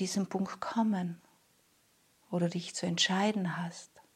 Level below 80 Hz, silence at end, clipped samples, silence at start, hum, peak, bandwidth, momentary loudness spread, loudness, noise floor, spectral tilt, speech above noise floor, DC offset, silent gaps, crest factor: -82 dBFS; 0.15 s; under 0.1%; 0 s; none; -16 dBFS; 13.5 kHz; 13 LU; -33 LUFS; -69 dBFS; -4.5 dB/octave; 36 dB; under 0.1%; none; 18 dB